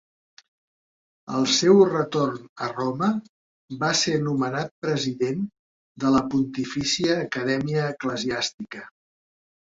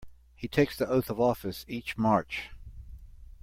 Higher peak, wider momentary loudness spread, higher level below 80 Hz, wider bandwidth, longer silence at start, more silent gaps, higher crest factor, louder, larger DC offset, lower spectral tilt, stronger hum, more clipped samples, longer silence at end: first, -4 dBFS vs -10 dBFS; second, 12 LU vs 20 LU; second, -60 dBFS vs -50 dBFS; second, 7.8 kHz vs 16.5 kHz; first, 1.25 s vs 0 s; first, 2.49-2.56 s, 3.29-3.69 s, 4.71-4.82 s, 5.59-5.95 s, 8.54-8.58 s vs none; about the same, 20 dB vs 20 dB; first, -24 LUFS vs -29 LUFS; neither; second, -4.5 dB/octave vs -6.5 dB/octave; neither; neither; first, 0.9 s vs 0.1 s